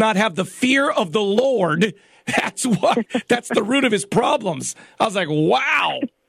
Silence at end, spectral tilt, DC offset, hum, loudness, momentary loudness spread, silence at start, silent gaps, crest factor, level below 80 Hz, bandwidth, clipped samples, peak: 0.2 s; -4.5 dB/octave; under 0.1%; none; -19 LUFS; 5 LU; 0 s; none; 14 dB; -62 dBFS; 14.5 kHz; under 0.1%; -4 dBFS